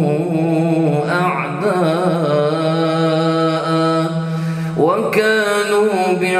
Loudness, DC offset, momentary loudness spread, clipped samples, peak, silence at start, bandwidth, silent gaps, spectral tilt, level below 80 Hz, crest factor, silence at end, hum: -16 LUFS; under 0.1%; 4 LU; under 0.1%; -2 dBFS; 0 s; 14.5 kHz; none; -6.5 dB/octave; -60 dBFS; 14 dB; 0 s; none